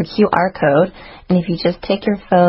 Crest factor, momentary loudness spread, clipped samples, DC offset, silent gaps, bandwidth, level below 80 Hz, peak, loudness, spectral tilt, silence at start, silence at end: 16 dB; 5 LU; under 0.1%; under 0.1%; none; 5.8 kHz; -44 dBFS; 0 dBFS; -17 LUFS; -9.5 dB/octave; 0 s; 0 s